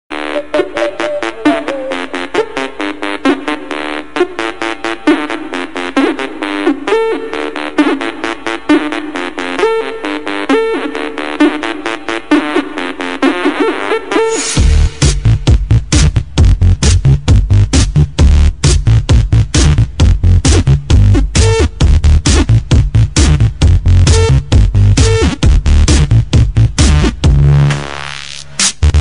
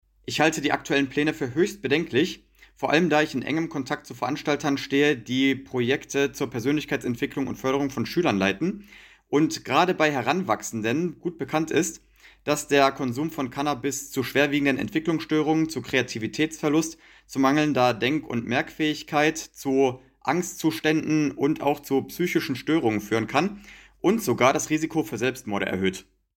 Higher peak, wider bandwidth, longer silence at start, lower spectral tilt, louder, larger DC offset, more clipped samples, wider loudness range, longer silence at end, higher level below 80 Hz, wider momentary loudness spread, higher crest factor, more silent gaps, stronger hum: first, 0 dBFS vs -6 dBFS; second, 11 kHz vs 17 kHz; second, 0.1 s vs 0.3 s; about the same, -5.5 dB/octave vs -4.5 dB/octave; first, -12 LUFS vs -25 LUFS; first, 3% vs under 0.1%; neither; first, 6 LU vs 1 LU; second, 0 s vs 0.35 s; first, -14 dBFS vs -58 dBFS; about the same, 9 LU vs 7 LU; second, 10 dB vs 20 dB; neither; neither